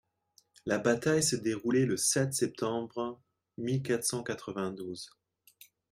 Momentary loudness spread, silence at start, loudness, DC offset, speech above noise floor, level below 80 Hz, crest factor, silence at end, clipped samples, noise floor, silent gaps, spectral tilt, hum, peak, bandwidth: 13 LU; 0.65 s; -31 LUFS; under 0.1%; 38 dB; -72 dBFS; 20 dB; 0.85 s; under 0.1%; -69 dBFS; none; -4 dB/octave; none; -12 dBFS; 16 kHz